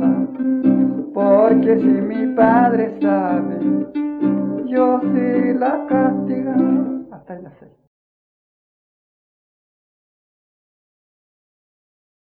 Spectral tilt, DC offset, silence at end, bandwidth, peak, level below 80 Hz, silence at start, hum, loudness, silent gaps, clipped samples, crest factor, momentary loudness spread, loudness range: -11.5 dB/octave; under 0.1%; 4.85 s; 4.3 kHz; 0 dBFS; -58 dBFS; 0 s; none; -17 LUFS; none; under 0.1%; 18 dB; 8 LU; 9 LU